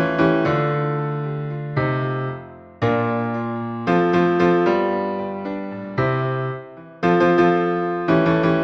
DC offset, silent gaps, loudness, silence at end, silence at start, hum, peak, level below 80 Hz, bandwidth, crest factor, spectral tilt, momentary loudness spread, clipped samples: under 0.1%; none; -20 LUFS; 0 s; 0 s; none; -4 dBFS; -52 dBFS; 6.2 kHz; 16 dB; -8.5 dB/octave; 11 LU; under 0.1%